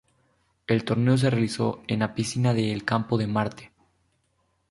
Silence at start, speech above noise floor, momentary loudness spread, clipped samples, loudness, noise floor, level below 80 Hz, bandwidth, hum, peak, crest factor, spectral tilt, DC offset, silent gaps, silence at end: 0.7 s; 47 dB; 6 LU; under 0.1%; -25 LUFS; -71 dBFS; -58 dBFS; 11.5 kHz; none; -8 dBFS; 18 dB; -6.5 dB/octave; under 0.1%; none; 1.05 s